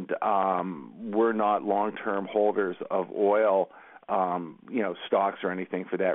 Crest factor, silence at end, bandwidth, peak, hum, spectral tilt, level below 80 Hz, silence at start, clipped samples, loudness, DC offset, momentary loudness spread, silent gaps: 16 dB; 0 s; 3.9 kHz; -12 dBFS; none; -10 dB/octave; -76 dBFS; 0 s; under 0.1%; -27 LUFS; under 0.1%; 9 LU; none